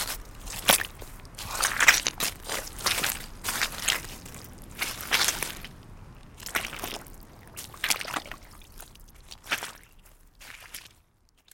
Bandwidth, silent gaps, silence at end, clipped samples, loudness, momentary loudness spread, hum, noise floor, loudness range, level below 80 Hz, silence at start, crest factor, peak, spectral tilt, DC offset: 17 kHz; none; 0.65 s; under 0.1%; -27 LUFS; 23 LU; none; -64 dBFS; 9 LU; -48 dBFS; 0 s; 30 dB; 0 dBFS; -0.5 dB/octave; under 0.1%